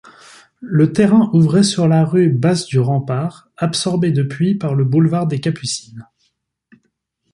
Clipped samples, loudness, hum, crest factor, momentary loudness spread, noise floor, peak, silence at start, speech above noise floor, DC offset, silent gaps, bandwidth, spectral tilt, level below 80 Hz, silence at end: under 0.1%; -16 LUFS; none; 14 dB; 10 LU; -68 dBFS; -2 dBFS; 0.6 s; 53 dB; under 0.1%; none; 11.5 kHz; -6.5 dB/octave; -56 dBFS; 1.3 s